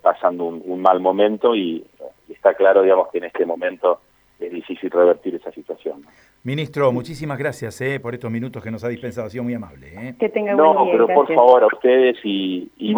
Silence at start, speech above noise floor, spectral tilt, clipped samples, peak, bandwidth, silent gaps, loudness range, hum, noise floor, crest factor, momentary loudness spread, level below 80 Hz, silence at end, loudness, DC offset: 0.05 s; 21 dB; -7 dB/octave; under 0.1%; 0 dBFS; over 20 kHz; none; 9 LU; none; -39 dBFS; 18 dB; 17 LU; -60 dBFS; 0 s; -18 LUFS; under 0.1%